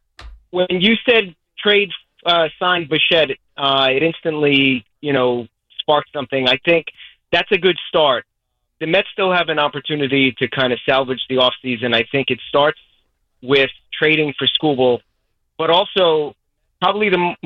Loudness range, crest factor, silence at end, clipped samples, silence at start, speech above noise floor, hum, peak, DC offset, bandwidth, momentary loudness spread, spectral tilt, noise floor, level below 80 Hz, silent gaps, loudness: 2 LU; 16 dB; 0.1 s; under 0.1%; 0.2 s; 55 dB; none; -2 dBFS; under 0.1%; 6.8 kHz; 8 LU; -6.5 dB/octave; -72 dBFS; -52 dBFS; none; -16 LUFS